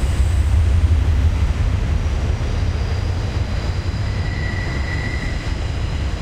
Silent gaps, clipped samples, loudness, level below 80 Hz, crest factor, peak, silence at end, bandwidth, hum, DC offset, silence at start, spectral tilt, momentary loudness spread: none; under 0.1%; -21 LUFS; -20 dBFS; 14 dB; -4 dBFS; 0 s; 9.8 kHz; none; under 0.1%; 0 s; -6.5 dB/octave; 7 LU